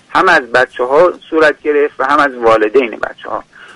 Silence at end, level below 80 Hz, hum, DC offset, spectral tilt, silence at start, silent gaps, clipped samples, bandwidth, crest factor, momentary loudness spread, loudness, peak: 0.05 s; -48 dBFS; none; under 0.1%; -4.5 dB/octave; 0.1 s; none; under 0.1%; 11.5 kHz; 12 dB; 12 LU; -11 LUFS; 0 dBFS